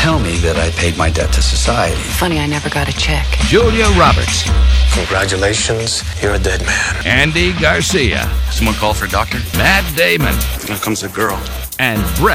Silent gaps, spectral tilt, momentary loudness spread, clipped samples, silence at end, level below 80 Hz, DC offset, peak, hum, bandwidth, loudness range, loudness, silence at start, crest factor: none; -4 dB/octave; 6 LU; under 0.1%; 0 s; -18 dBFS; under 0.1%; 0 dBFS; none; 16.5 kHz; 2 LU; -14 LUFS; 0 s; 14 dB